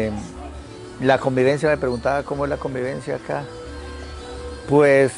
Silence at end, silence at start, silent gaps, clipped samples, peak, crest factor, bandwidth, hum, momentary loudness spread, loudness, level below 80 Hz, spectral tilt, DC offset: 0 s; 0 s; none; under 0.1%; -2 dBFS; 18 dB; 11.5 kHz; none; 18 LU; -21 LUFS; -40 dBFS; -6.5 dB/octave; under 0.1%